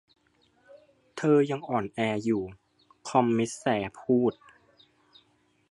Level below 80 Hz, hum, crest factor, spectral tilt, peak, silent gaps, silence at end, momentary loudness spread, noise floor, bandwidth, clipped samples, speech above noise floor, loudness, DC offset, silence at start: -66 dBFS; none; 22 dB; -6 dB/octave; -8 dBFS; none; 1.4 s; 7 LU; -67 dBFS; 11.5 kHz; under 0.1%; 41 dB; -27 LUFS; under 0.1%; 0.75 s